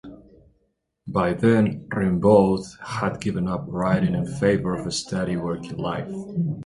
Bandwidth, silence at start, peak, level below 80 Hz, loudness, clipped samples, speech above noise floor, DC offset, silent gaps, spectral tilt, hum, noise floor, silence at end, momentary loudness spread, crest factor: 11.5 kHz; 0.05 s; -4 dBFS; -48 dBFS; -23 LUFS; under 0.1%; 49 dB; under 0.1%; none; -6.5 dB/octave; none; -71 dBFS; 0 s; 11 LU; 20 dB